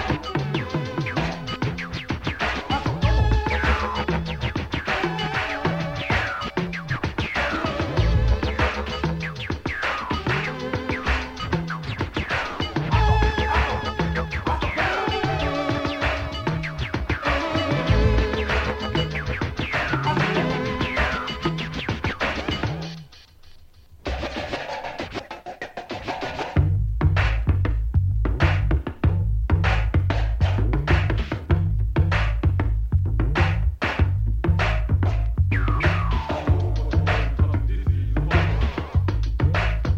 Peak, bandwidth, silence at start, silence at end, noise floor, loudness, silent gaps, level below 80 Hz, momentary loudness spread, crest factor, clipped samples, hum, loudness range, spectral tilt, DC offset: -6 dBFS; 8 kHz; 0 s; 0 s; -47 dBFS; -24 LUFS; none; -28 dBFS; 7 LU; 18 dB; under 0.1%; none; 4 LU; -6.5 dB/octave; under 0.1%